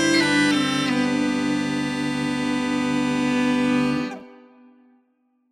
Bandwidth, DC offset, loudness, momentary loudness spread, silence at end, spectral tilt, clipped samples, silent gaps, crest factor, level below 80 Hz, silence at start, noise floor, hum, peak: 13.5 kHz; under 0.1%; -22 LUFS; 6 LU; 1.15 s; -4 dB/octave; under 0.1%; none; 16 dB; -54 dBFS; 0 s; -66 dBFS; none; -6 dBFS